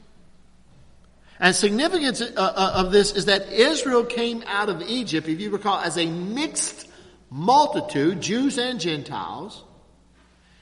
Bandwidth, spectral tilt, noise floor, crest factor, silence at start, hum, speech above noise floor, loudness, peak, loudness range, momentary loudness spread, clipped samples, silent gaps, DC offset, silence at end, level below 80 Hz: 11.5 kHz; -3.5 dB/octave; -56 dBFS; 24 dB; 1.4 s; none; 34 dB; -22 LUFS; 0 dBFS; 4 LU; 10 LU; under 0.1%; none; under 0.1%; 1 s; -48 dBFS